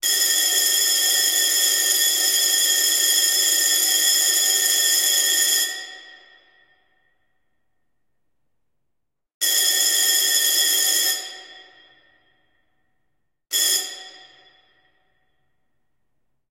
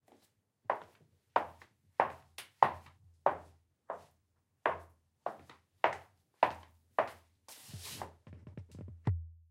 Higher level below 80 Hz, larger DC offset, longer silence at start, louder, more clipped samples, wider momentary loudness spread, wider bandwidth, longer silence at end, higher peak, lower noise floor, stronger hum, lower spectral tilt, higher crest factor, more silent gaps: second, -80 dBFS vs -62 dBFS; neither; second, 0.05 s vs 0.7 s; first, -16 LUFS vs -37 LUFS; neither; second, 7 LU vs 18 LU; about the same, 16 kHz vs 16 kHz; first, 2.35 s vs 0.15 s; about the same, -4 dBFS vs -6 dBFS; about the same, -79 dBFS vs -78 dBFS; neither; second, 5 dB/octave vs -5 dB/octave; second, 18 dB vs 34 dB; first, 9.34-9.40 s vs none